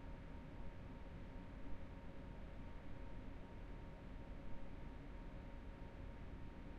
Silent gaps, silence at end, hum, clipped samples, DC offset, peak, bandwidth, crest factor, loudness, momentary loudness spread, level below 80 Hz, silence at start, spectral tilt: none; 0 s; none; under 0.1%; under 0.1%; -36 dBFS; 8.2 kHz; 16 dB; -56 LUFS; 1 LU; -54 dBFS; 0 s; -8 dB/octave